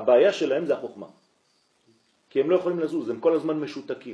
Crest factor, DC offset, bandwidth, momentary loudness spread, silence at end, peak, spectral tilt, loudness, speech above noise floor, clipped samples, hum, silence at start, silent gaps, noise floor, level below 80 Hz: 18 dB; under 0.1%; 10.5 kHz; 15 LU; 0 s; -6 dBFS; -6 dB/octave; -25 LUFS; 44 dB; under 0.1%; none; 0 s; none; -67 dBFS; -80 dBFS